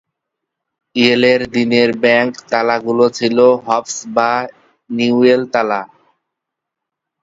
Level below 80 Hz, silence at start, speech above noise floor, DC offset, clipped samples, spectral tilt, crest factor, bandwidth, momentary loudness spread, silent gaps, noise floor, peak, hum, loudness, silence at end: -58 dBFS; 0.95 s; 67 dB; under 0.1%; under 0.1%; -4.5 dB/octave; 16 dB; 7.8 kHz; 8 LU; none; -80 dBFS; 0 dBFS; none; -14 LUFS; 1.35 s